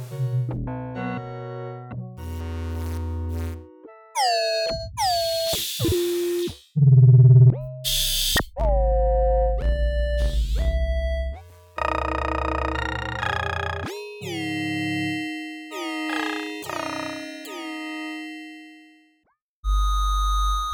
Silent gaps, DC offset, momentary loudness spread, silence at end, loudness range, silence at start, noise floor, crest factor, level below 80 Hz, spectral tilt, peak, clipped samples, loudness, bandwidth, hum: 19.42-19.63 s; under 0.1%; 14 LU; 0 s; 13 LU; 0 s; -69 dBFS; 18 dB; -30 dBFS; -5.5 dB/octave; -6 dBFS; under 0.1%; -23 LUFS; over 20 kHz; none